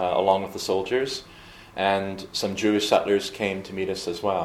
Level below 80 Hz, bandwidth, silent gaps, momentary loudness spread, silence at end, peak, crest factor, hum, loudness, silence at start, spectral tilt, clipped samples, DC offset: -58 dBFS; 15.5 kHz; none; 9 LU; 0 s; -6 dBFS; 20 dB; none; -25 LUFS; 0 s; -4 dB/octave; under 0.1%; under 0.1%